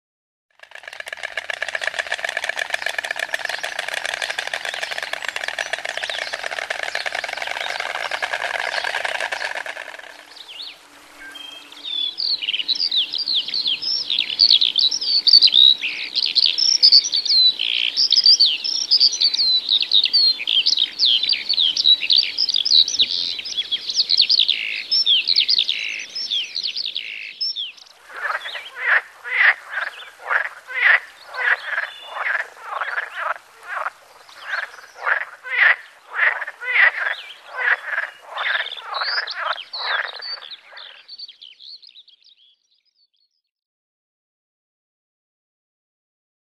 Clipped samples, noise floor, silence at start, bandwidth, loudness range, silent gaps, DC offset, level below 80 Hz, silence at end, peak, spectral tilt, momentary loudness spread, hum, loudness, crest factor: under 0.1%; -67 dBFS; 0.85 s; 14 kHz; 13 LU; none; under 0.1%; -70 dBFS; 4.6 s; 0 dBFS; 2.5 dB/octave; 18 LU; none; -17 LUFS; 20 dB